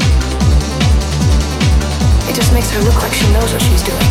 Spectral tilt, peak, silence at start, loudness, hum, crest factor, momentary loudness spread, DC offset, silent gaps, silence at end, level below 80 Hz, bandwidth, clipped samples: -5 dB/octave; -2 dBFS; 0 s; -13 LUFS; none; 8 dB; 1 LU; under 0.1%; none; 0 s; -14 dBFS; 16 kHz; under 0.1%